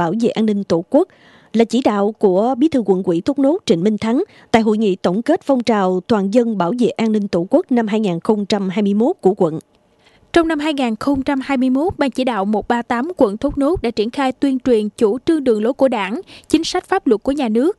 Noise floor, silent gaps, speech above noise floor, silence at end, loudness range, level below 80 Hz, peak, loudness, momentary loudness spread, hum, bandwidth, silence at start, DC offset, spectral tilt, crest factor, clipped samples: -53 dBFS; none; 37 dB; 0.05 s; 2 LU; -46 dBFS; 0 dBFS; -17 LUFS; 4 LU; none; 12 kHz; 0 s; under 0.1%; -6.5 dB/octave; 16 dB; under 0.1%